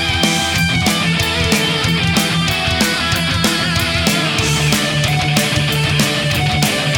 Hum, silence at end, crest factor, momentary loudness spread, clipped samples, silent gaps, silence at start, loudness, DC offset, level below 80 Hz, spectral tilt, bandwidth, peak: none; 0 s; 16 dB; 1 LU; under 0.1%; none; 0 s; -14 LUFS; 0.2%; -32 dBFS; -3.5 dB/octave; 19 kHz; 0 dBFS